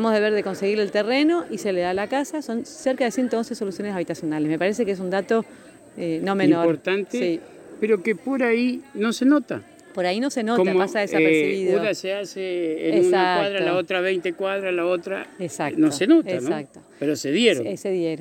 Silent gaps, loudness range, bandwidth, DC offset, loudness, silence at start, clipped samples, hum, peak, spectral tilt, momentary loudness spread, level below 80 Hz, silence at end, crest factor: none; 4 LU; 16.5 kHz; under 0.1%; -22 LUFS; 0 s; under 0.1%; none; -6 dBFS; -5 dB/octave; 10 LU; -68 dBFS; 0 s; 16 dB